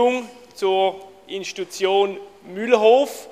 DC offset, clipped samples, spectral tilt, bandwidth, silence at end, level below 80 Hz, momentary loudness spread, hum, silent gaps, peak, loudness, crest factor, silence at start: under 0.1%; under 0.1%; -3.5 dB/octave; 15 kHz; 0.05 s; -70 dBFS; 21 LU; none; none; -2 dBFS; -20 LUFS; 18 dB; 0 s